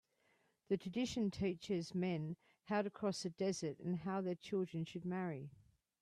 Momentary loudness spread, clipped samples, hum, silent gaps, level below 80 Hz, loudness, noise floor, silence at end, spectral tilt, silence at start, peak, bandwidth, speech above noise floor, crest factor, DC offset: 5 LU; under 0.1%; none; none; -72 dBFS; -42 LUFS; -78 dBFS; 0.5 s; -6 dB/octave; 0.7 s; -26 dBFS; 11.5 kHz; 37 dB; 16 dB; under 0.1%